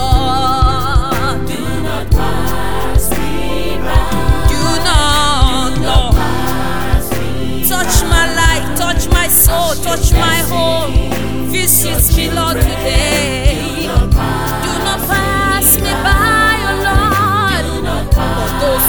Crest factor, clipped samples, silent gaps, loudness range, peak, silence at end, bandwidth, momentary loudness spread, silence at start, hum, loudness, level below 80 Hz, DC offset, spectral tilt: 12 dB; under 0.1%; none; 4 LU; 0 dBFS; 0 s; over 20 kHz; 8 LU; 0 s; none; -13 LUFS; -18 dBFS; under 0.1%; -4 dB/octave